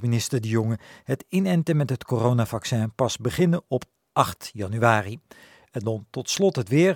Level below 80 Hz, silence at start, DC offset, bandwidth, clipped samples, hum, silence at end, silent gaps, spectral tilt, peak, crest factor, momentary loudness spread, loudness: -58 dBFS; 0 s; under 0.1%; 18 kHz; under 0.1%; none; 0 s; none; -6 dB/octave; -2 dBFS; 22 dB; 10 LU; -24 LUFS